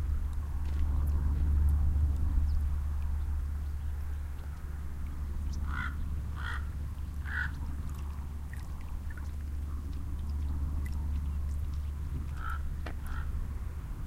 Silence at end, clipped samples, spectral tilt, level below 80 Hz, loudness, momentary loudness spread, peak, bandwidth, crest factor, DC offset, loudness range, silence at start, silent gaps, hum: 0 s; under 0.1%; -7 dB/octave; -34 dBFS; -36 LUFS; 10 LU; -16 dBFS; 13 kHz; 16 dB; under 0.1%; 7 LU; 0 s; none; none